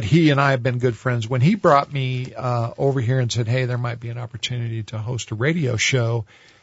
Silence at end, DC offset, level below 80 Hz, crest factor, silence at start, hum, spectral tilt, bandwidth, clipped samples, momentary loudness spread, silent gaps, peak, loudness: 0.4 s; under 0.1%; -54 dBFS; 20 dB; 0 s; none; -6 dB/octave; 8 kHz; under 0.1%; 11 LU; none; 0 dBFS; -21 LUFS